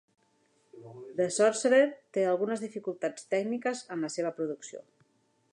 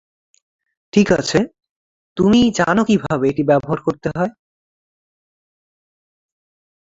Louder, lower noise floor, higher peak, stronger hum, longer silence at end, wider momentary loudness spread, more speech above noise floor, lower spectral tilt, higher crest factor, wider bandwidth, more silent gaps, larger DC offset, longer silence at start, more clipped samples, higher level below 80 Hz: second, -30 LUFS vs -17 LUFS; second, -71 dBFS vs under -90 dBFS; second, -12 dBFS vs -2 dBFS; neither; second, 0.7 s vs 2.55 s; first, 17 LU vs 9 LU; second, 41 dB vs over 74 dB; second, -4 dB/octave vs -6 dB/octave; about the same, 20 dB vs 18 dB; first, 11 kHz vs 7.8 kHz; second, none vs 1.71-2.16 s; neither; second, 0.75 s vs 0.95 s; neither; second, -86 dBFS vs -48 dBFS